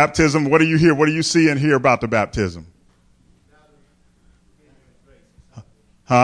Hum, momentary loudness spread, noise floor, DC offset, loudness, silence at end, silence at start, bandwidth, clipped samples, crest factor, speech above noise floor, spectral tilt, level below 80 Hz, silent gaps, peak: none; 9 LU; -56 dBFS; under 0.1%; -17 LUFS; 0 s; 0 s; 10.5 kHz; under 0.1%; 16 dB; 40 dB; -5.5 dB/octave; -44 dBFS; none; -2 dBFS